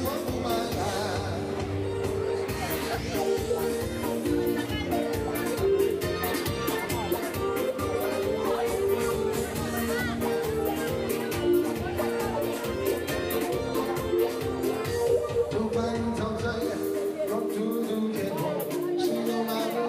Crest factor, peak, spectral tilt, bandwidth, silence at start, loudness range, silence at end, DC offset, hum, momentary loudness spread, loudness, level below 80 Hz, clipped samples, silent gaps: 14 dB; -14 dBFS; -5 dB/octave; 16 kHz; 0 s; 1 LU; 0 s; under 0.1%; none; 4 LU; -28 LUFS; -46 dBFS; under 0.1%; none